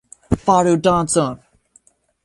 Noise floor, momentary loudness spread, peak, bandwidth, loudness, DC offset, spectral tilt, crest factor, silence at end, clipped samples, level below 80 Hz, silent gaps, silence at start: -56 dBFS; 10 LU; -2 dBFS; 11.5 kHz; -17 LUFS; under 0.1%; -5.5 dB/octave; 18 dB; 0.9 s; under 0.1%; -40 dBFS; none; 0.3 s